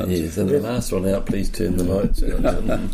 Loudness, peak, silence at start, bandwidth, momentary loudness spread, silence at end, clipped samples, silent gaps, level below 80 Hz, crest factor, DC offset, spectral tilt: -22 LUFS; -8 dBFS; 0 s; 15.5 kHz; 3 LU; 0 s; under 0.1%; none; -24 dBFS; 12 dB; under 0.1%; -6.5 dB/octave